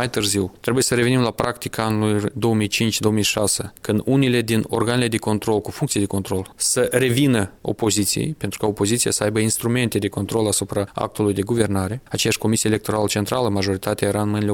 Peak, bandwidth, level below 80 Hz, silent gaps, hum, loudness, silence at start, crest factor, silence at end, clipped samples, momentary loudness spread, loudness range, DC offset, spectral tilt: -2 dBFS; 18 kHz; -50 dBFS; none; none; -20 LUFS; 0 s; 18 dB; 0 s; under 0.1%; 6 LU; 1 LU; under 0.1%; -4.5 dB/octave